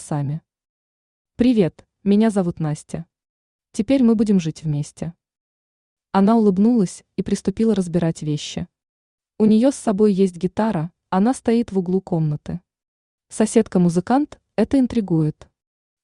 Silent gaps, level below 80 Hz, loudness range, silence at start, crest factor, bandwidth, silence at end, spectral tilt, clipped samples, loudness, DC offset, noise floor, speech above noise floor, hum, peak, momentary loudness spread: 0.69-1.25 s, 3.29-3.59 s, 5.40-5.97 s, 8.89-9.18 s, 12.88-13.18 s; -52 dBFS; 3 LU; 0 s; 18 dB; 11 kHz; 0.7 s; -7 dB/octave; under 0.1%; -20 LUFS; under 0.1%; under -90 dBFS; over 71 dB; none; -2 dBFS; 13 LU